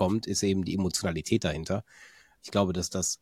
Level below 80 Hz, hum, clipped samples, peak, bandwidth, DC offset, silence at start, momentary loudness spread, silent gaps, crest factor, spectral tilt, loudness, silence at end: -52 dBFS; none; under 0.1%; -10 dBFS; 16 kHz; under 0.1%; 0 s; 6 LU; none; 20 dB; -4.5 dB/octave; -29 LUFS; 0.05 s